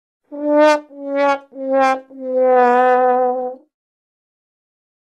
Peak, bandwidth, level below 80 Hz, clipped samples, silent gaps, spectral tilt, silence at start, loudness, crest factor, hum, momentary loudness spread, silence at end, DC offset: -2 dBFS; 9.8 kHz; -74 dBFS; under 0.1%; none; -3 dB/octave; 0.3 s; -16 LUFS; 16 dB; none; 12 LU; 1.45 s; under 0.1%